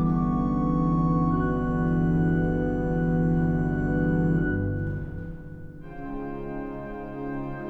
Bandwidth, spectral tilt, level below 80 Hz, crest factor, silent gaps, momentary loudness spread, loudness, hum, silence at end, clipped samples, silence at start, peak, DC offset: 3.3 kHz; -11 dB/octave; -36 dBFS; 12 dB; none; 13 LU; -26 LUFS; none; 0 s; under 0.1%; 0 s; -12 dBFS; under 0.1%